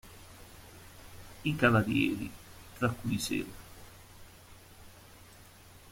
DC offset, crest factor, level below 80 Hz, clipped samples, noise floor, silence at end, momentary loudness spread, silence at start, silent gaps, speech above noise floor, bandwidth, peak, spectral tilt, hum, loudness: under 0.1%; 24 dB; -56 dBFS; under 0.1%; -55 dBFS; 0 s; 27 LU; 0.05 s; none; 25 dB; 16.5 kHz; -10 dBFS; -5.5 dB/octave; none; -31 LUFS